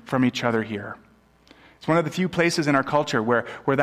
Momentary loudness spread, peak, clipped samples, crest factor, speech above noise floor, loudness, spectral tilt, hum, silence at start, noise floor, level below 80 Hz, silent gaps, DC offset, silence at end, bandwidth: 12 LU; -6 dBFS; under 0.1%; 18 dB; 32 dB; -23 LUFS; -5.5 dB/octave; none; 0.05 s; -55 dBFS; -60 dBFS; none; under 0.1%; 0 s; 15 kHz